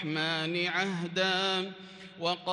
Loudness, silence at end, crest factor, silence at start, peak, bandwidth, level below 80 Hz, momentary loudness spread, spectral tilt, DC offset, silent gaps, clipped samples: -30 LUFS; 0 s; 16 dB; 0 s; -16 dBFS; 11.5 kHz; -78 dBFS; 12 LU; -4 dB/octave; under 0.1%; none; under 0.1%